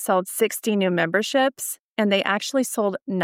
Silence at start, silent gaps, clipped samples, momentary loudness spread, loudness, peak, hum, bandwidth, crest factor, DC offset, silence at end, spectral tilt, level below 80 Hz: 0 s; 1.80-1.96 s, 3.02-3.06 s; under 0.1%; 5 LU; -22 LUFS; -6 dBFS; none; 17 kHz; 18 dB; under 0.1%; 0 s; -4 dB/octave; -80 dBFS